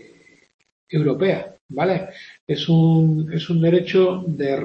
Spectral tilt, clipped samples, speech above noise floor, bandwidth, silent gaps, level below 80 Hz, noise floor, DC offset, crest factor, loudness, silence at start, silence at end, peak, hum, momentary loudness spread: -8.5 dB/octave; under 0.1%; 33 dB; 6.2 kHz; 1.61-1.69 s, 2.41-2.47 s; -60 dBFS; -51 dBFS; under 0.1%; 14 dB; -19 LUFS; 0.9 s; 0 s; -6 dBFS; none; 11 LU